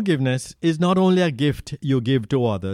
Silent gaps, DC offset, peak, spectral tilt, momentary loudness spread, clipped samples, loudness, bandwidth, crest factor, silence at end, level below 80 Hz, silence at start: none; under 0.1%; -6 dBFS; -7 dB/octave; 6 LU; under 0.1%; -21 LUFS; 13.5 kHz; 14 dB; 0 s; -50 dBFS; 0 s